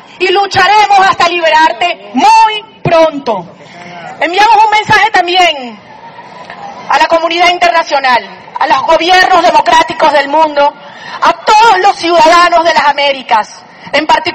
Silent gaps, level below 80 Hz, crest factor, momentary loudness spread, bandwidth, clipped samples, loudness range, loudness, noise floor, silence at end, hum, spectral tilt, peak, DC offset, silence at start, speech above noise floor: none; -44 dBFS; 8 dB; 13 LU; 13.5 kHz; 1%; 3 LU; -7 LUFS; -30 dBFS; 0 s; none; -3 dB/octave; 0 dBFS; under 0.1%; 0.2 s; 22 dB